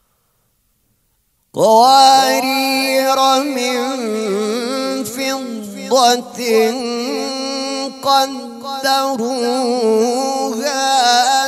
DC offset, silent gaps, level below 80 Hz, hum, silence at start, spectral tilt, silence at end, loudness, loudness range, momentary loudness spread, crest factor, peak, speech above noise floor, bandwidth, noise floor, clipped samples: under 0.1%; none; -68 dBFS; none; 1.55 s; -2 dB/octave; 0 s; -15 LUFS; 5 LU; 10 LU; 16 dB; 0 dBFS; 49 dB; 16 kHz; -63 dBFS; under 0.1%